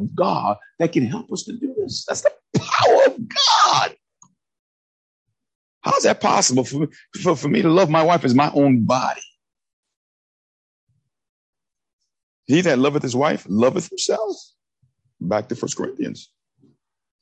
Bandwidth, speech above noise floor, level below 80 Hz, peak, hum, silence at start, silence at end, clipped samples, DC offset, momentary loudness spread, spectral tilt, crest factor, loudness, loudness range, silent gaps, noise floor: 9.4 kHz; 49 dB; -62 dBFS; -2 dBFS; none; 0 s; 1 s; under 0.1%; under 0.1%; 12 LU; -4.5 dB/octave; 18 dB; -19 LUFS; 7 LU; 4.59-5.26 s, 5.55-5.81 s, 9.73-9.83 s, 9.96-10.87 s, 11.29-11.53 s, 11.93-11.99 s, 12.23-12.43 s; -67 dBFS